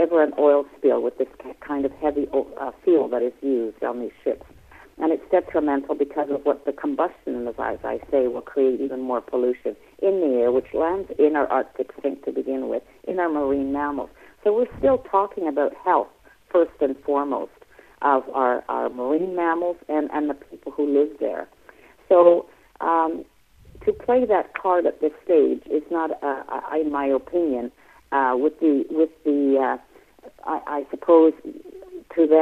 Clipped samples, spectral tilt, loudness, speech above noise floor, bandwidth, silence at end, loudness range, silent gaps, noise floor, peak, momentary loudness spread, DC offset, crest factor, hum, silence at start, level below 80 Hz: under 0.1%; -7.5 dB/octave; -23 LUFS; 29 dB; 4.3 kHz; 0 s; 3 LU; none; -51 dBFS; -2 dBFS; 11 LU; under 0.1%; 20 dB; none; 0 s; -56 dBFS